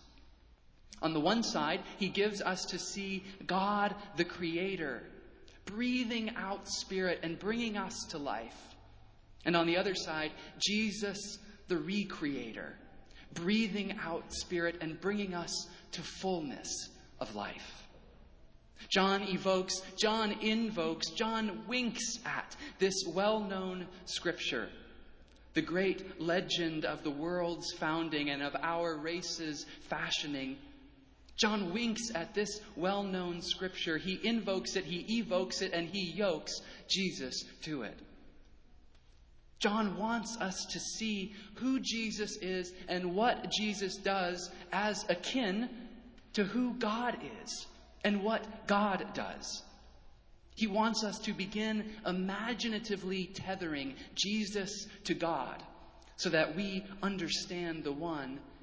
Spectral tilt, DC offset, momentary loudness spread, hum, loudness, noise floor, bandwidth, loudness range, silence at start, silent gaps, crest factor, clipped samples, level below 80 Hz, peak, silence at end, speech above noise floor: -4 dB/octave; under 0.1%; 10 LU; none; -35 LUFS; -61 dBFS; 8 kHz; 3 LU; 0.05 s; none; 22 dB; under 0.1%; -62 dBFS; -14 dBFS; 0 s; 26 dB